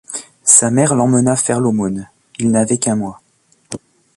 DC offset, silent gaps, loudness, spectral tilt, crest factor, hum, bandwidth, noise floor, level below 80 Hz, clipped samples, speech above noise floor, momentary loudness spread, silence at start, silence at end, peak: under 0.1%; none; -14 LUFS; -5 dB/octave; 16 dB; none; 13 kHz; -37 dBFS; -52 dBFS; under 0.1%; 23 dB; 22 LU; 0.1 s; 0.4 s; 0 dBFS